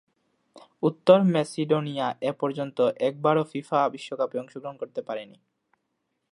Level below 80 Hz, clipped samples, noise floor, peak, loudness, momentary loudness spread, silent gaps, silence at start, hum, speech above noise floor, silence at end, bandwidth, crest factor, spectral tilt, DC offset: -76 dBFS; under 0.1%; -78 dBFS; -4 dBFS; -25 LUFS; 16 LU; none; 0.55 s; none; 53 dB; 1.1 s; 11 kHz; 22 dB; -7 dB/octave; under 0.1%